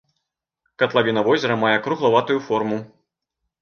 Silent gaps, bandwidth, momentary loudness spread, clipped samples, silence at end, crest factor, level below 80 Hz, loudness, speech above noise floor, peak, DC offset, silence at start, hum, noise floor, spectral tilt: none; 6.8 kHz; 5 LU; under 0.1%; 0.75 s; 18 dB; -66 dBFS; -20 LUFS; 60 dB; -4 dBFS; under 0.1%; 0.8 s; none; -80 dBFS; -6 dB/octave